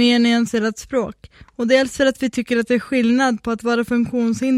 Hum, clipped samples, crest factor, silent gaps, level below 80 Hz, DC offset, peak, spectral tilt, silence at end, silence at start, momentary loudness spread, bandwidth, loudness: none; under 0.1%; 16 dB; none; -50 dBFS; under 0.1%; -2 dBFS; -4.5 dB/octave; 0 s; 0 s; 8 LU; 13 kHz; -19 LUFS